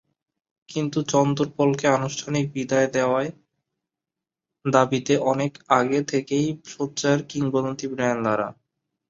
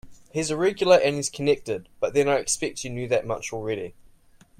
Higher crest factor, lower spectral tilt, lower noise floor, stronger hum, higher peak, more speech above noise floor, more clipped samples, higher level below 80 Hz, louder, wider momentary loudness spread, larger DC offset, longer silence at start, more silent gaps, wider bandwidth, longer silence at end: about the same, 22 dB vs 20 dB; first, -5.5 dB/octave vs -4 dB/octave; first, -88 dBFS vs -55 dBFS; neither; first, -2 dBFS vs -6 dBFS; first, 65 dB vs 31 dB; neither; second, -64 dBFS vs -54 dBFS; about the same, -23 LUFS vs -24 LUFS; second, 8 LU vs 13 LU; neither; first, 0.7 s vs 0.05 s; neither; second, 7.8 kHz vs 16 kHz; about the same, 0.6 s vs 0.7 s